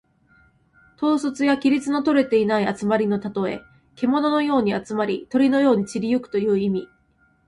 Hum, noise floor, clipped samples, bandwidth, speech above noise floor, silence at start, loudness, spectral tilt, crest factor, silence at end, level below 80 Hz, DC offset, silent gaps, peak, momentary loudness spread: none; -62 dBFS; under 0.1%; 11 kHz; 41 dB; 1 s; -21 LUFS; -6.5 dB/octave; 14 dB; 0.6 s; -60 dBFS; under 0.1%; none; -6 dBFS; 7 LU